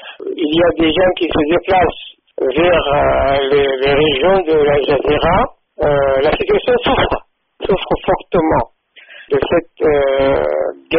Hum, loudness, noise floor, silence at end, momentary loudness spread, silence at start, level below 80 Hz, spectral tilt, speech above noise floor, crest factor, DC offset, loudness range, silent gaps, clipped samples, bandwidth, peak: none; -14 LUFS; -41 dBFS; 0 s; 7 LU; 0 s; -32 dBFS; -3.5 dB/octave; 27 dB; 12 dB; under 0.1%; 3 LU; none; under 0.1%; 5.2 kHz; -2 dBFS